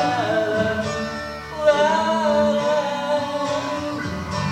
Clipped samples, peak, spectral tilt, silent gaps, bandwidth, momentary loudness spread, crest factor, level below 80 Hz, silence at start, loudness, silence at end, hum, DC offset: under 0.1%; -4 dBFS; -5 dB/octave; none; 14 kHz; 9 LU; 16 dB; -48 dBFS; 0 s; -21 LUFS; 0 s; none; under 0.1%